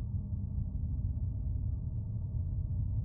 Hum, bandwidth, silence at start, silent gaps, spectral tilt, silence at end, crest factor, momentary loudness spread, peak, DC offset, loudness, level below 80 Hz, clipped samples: none; 1.3 kHz; 0 s; none; -14.5 dB/octave; 0 s; 12 dB; 2 LU; -22 dBFS; under 0.1%; -37 LUFS; -40 dBFS; under 0.1%